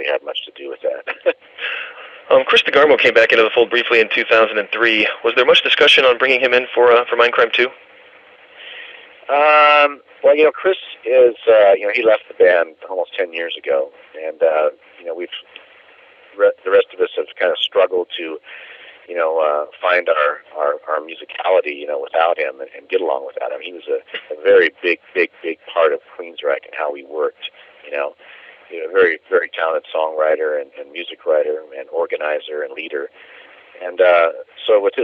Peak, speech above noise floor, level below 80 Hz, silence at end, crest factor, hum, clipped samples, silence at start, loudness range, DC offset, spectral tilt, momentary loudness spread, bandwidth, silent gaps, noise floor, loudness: 0 dBFS; 30 dB; -66 dBFS; 0 s; 16 dB; none; under 0.1%; 0 s; 9 LU; under 0.1%; -3 dB/octave; 17 LU; 8.6 kHz; none; -46 dBFS; -16 LUFS